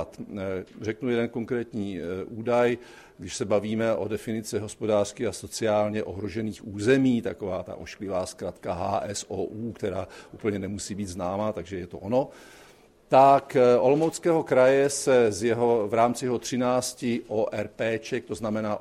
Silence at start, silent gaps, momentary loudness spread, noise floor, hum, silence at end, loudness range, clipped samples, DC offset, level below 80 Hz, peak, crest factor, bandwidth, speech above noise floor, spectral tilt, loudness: 0 s; none; 13 LU; -55 dBFS; none; 0 s; 10 LU; under 0.1%; under 0.1%; -58 dBFS; -6 dBFS; 20 dB; 14.5 kHz; 29 dB; -5.5 dB/octave; -26 LUFS